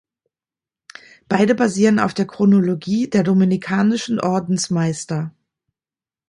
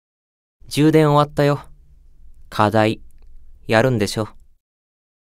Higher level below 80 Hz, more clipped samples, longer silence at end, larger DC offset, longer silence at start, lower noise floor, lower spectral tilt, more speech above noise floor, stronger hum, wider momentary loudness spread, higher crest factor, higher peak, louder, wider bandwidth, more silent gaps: second, -60 dBFS vs -44 dBFS; neither; about the same, 1 s vs 1.05 s; neither; first, 1.3 s vs 0.65 s; first, under -90 dBFS vs -46 dBFS; about the same, -6 dB/octave vs -6.5 dB/octave; first, over 73 dB vs 30 dB; neither; second, 7 LU vs 16 LU; about the same, 16 dB vs 20 dB; about the same, -2 dBFS vs 0 dBFS; about the same, -18 LUFS vs -18 LUFS; second, 11 kHz vs 15.5 kHz; neither